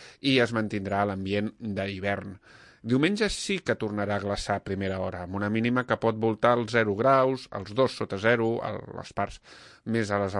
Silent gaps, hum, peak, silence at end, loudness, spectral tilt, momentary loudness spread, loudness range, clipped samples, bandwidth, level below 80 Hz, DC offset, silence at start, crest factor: none; none; -8 dBFS; 0 s; -27 LUFS; -5.5 dB/octave; 10 LU; 4 LU; under 0.1%; 11.5 kHz; -54 dBFS; under 0.1%; 0 s; 20 dB